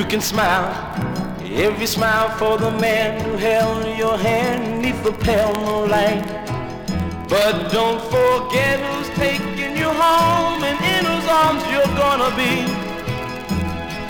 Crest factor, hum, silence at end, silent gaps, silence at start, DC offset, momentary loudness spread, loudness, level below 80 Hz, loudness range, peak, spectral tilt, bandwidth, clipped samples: 14 dB; none; 0 s; none; 0 s; under 0.1%; 8 LU; -19 LUFS; -40 dBFS; 3 LU; -4 dBFS; -4.5 dB/octave; 19.5 kHz; under 0.1%